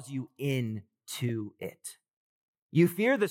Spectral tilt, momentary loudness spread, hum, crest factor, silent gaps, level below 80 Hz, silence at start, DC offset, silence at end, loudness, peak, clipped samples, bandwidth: -6 dB/octave; 16 LU; none; 20 dB; 2.13-2.54 s, 2.62-2.69 s; -84 dBFS; 0 s; under 0.1%; 0 s; -31 LUFS; -12 dBFS; under 0.1%; 17 kHz